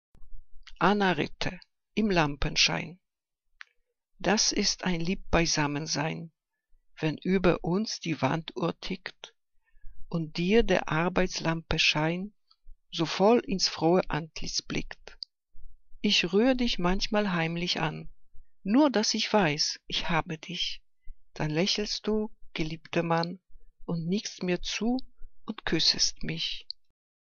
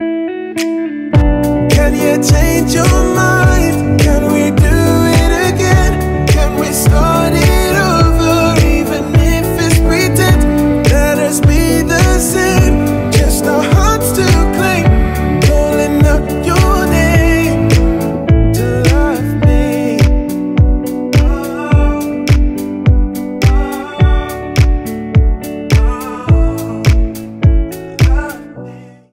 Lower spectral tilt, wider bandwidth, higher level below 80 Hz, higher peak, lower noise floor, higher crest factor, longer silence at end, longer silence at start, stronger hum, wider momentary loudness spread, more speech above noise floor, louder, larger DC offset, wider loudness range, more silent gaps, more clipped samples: second, -4 dB/octave vs -6 dB/octave; second, 7.4 kHz vs 16.5 kHz; second, -44 dBFS vs -16 dBFS; second, -8 dBFS vs 0 dBFS; first, -80 dBFS vs -32 dBFS; first, 22 dB vs 10 dB; first, 0.6 s vs 0.25 s; first, 0.2 s vs 0 s; neither; first, 13 LU vs 7 LU; first, 53 dB vs 23 dB; second, -28 LUFS vs -12 LUFS; neither; about the same, 4 LU vs 3 LU; neither; neither